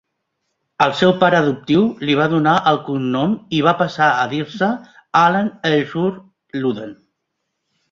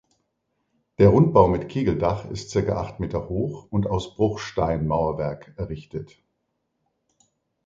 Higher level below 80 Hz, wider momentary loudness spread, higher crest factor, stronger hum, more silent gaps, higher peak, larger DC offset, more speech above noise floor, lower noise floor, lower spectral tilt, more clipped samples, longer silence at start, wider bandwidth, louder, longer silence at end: second, -58 dBFS vs -42 dBFS; second, 9 LU vs 16 LU; second, 18 dB vs 24 dB; neither; neither; about the same, 0 dBFS vs 0 dBFS; neither; first, 58 dB vs 53 dB; about the same, -75 dBFS vs -76 dBFS; second, -6.5 dB/octave vs -8 dB/octave; neither; second, 0.8 s vs 1 s; about the same, 7.6 kHz vs 7.8 kHz; first, -17 LUFS vs -23 LUFS; second, 1 s vs 1.6 s